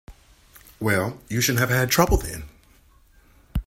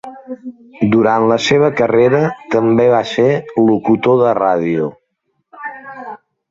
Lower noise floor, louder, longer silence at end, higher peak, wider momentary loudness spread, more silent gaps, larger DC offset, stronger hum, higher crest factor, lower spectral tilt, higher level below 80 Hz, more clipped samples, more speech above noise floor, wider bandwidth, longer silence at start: second, -55 dBFS vs -68 dBFS; second, -22 LUFS vs -13 LUFS; second, 0.05 s vs 0.35 s; about the same, -2 dBFS vs 0 dBFS; second, 14 LU vs 18 LU; neither; neither; neither; first, 22 dB vs 14 dB; second, -4 dB/octave vs -6.5 dB/octave; first, -34 dBFS vs -54 dBFS; neither; second, 33 dB vs 55 dB; first, 16.5 kHz vs 7.8 kHz; about the same, 0.1 s vs 0.05 s